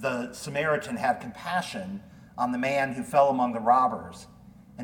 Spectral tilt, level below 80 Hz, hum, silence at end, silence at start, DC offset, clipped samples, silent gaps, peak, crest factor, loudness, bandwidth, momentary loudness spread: -5 dB/octave; -62 dBFS; none; 0 s; 0 s; under 0.1%; under 0.1%; none; -8 dBFS; 18 dB; -27 LUFS; 18.5 kHz; 17 LU